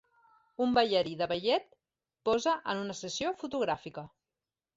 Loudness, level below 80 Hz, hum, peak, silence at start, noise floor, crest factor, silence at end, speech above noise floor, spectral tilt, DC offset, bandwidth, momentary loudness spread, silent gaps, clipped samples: -31 LUFS; -66 dBFS; none; -12 dBFS; 0.6 s; under -90 dBFS; 22 dB; 0.7 s; over 59 dB; -4 dB/octave; under 0.1%; 8 kHz; 14 LU; none; under 0.1%